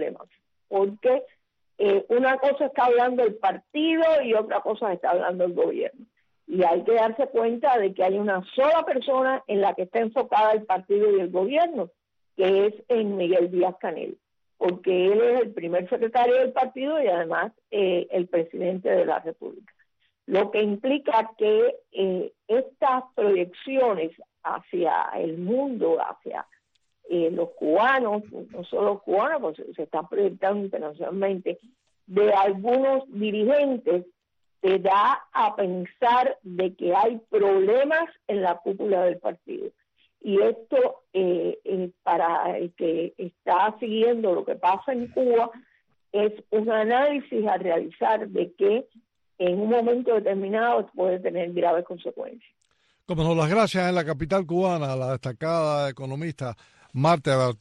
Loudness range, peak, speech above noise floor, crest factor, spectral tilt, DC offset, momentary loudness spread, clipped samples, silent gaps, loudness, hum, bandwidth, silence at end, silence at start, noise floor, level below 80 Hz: 3 LU; -10 dBFS; 45 dB; 14 dB; -7 dB/octave; under 0.1%; 10 LU; under 0.1%; none; -24 LUFS; none; 10 kHz; 0.05 s; 0 s; -68 dBFS; -62 dBFS